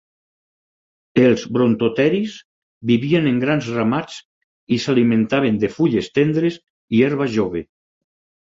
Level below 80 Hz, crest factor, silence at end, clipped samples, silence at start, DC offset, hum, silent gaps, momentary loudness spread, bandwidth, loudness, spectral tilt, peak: -54 dBFS; 16 dB; 0.8 s; under 0.1%; 1.15 s; under 0.1%; none; 2.45-2.81 s, 4.25-4.67 s, 6.70-6.88 s; 8 LU; 7.8 kHz; -18 LUFS; -7 dB/octave; -2 dBFS